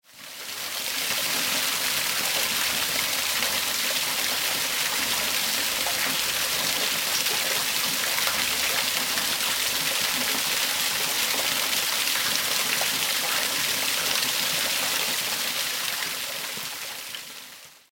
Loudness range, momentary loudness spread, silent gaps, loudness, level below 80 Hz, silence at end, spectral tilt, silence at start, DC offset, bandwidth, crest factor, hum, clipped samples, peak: 2 LU; 7 LU; none; -23 LUFS; -62 dBFS; 0.15 s; 0.5 dB/octave; 0.15 s; under 0.1%; 17 kHz; 22 dB; none; under 0.1%; -6 dBFS